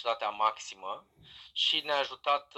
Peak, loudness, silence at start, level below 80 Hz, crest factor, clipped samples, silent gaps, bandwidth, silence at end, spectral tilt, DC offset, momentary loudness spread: -14 dBFS; -31 LUFS; 0 s; -76 dBFS; 18 dB; under 0.1%; none; 13.5 kHz; 0 s; -0.5 dB/octave; under 0.1%; 14 LU